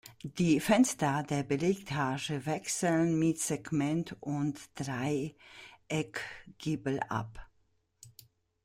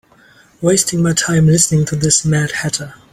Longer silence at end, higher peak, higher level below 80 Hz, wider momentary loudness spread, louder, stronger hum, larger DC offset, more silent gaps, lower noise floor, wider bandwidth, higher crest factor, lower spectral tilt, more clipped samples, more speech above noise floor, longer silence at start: first, 0.55 s vs 0.2 s; second, -12 dBFS vs 0 dBFS; second, -62 dBFS vs -44 dBFS; first, 13 LU vs 8 LU; second, -32 LUFS vs -14 LUFS; neither; neither; neither; first, -73 dBFS vs -48 dBFS; about the same, 16 kHz vs 15.5 kHz; about the same, 20 dB vs 16 dB; about the same, -5 dB/octave vs -4 dB/octave; neither; first, 41 dB vs 34 dB; second, 0.05 s vs 0.6 s